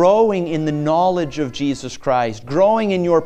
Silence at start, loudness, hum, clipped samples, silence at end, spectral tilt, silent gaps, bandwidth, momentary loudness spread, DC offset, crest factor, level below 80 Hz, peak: 0 s; -18 LUFS; none; under 0.1%; 0 s; -6.5 dB/octave; none; 9.4 kHz; 7 LU; under 0.1%; 14 dB; -48 dBFS; -2 dBFS